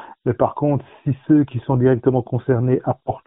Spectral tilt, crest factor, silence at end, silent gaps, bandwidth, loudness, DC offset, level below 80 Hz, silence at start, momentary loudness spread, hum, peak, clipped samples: -10 dB/octave; 16 dB; 0.1 s; none; 3.8 kHz; -19 LUFS; under 0.1%; -50 dBFS; 0 s; 8 LU; none; -2 dBFS; under 0.1%